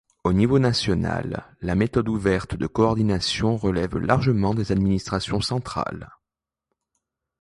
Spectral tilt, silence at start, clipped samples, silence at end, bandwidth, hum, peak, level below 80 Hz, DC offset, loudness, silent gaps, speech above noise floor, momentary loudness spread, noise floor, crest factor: -6.5 dB/octave; 0.25 s; under 0.1%; 1.35 s; 11.5 kHz; none; -4 dBFS; -40 dBFS; under 0.1%; -23 LUFS; none; 65 dB; 9 LU; -87 dBFS; 18 dB